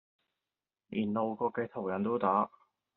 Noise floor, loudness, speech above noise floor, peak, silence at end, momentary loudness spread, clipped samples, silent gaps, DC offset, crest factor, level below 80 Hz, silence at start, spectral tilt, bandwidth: under -90 dBFS; -33 LUFS; over 58 dB; -16 dBFS; 0.5 s; 7 LU; under 0.1%; none; under 0.1%; 20 dB; -76 dBFS; 0.9 s; -6 dB/octave; 4.1 kHz